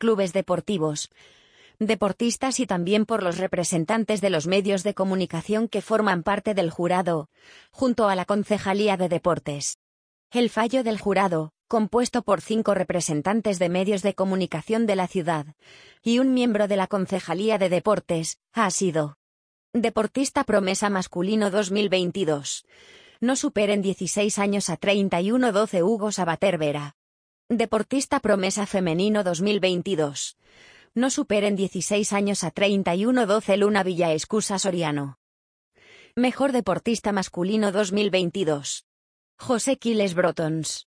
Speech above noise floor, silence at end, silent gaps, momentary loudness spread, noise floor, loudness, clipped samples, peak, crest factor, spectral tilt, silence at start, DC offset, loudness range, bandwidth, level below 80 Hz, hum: over 67 dB; 0.15 s; 9.75-10.30 s, 19.16-19.73 s, 26.94-27.49 s, 35.17-35.72 s, 38.83-39.38 s; 6 LU; under -90 dBFS; -24 LUFS; under 0.1%; -6 dBFS; 18 dB; -4.5 dB/octave; 0 s; under 0.1%; 2 LU; 10.5 kHz; -60 dBFS; none